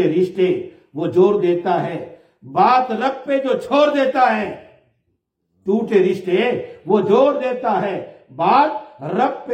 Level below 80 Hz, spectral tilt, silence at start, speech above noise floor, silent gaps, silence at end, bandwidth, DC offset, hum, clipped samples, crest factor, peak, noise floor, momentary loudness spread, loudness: -66 dBFS; -7 dB/octave; 0 s; 53 dB; none; 0 s; 8.8 kHz; under 0.1%; none; under 0.1%; 16 dB; -2 dBFS; -70 dBFS; 13 LU; -18 LUFS